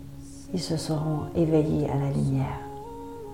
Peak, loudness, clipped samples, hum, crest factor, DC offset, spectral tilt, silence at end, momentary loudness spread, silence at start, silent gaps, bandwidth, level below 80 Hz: -12 dBFS; -27 LUFS; under 0.1%; none; 16 dB; 0.4%; -7.5 dB/octave; 0 s; 16 LU; 0 s; none; 15.5 kHz; -46 dBFS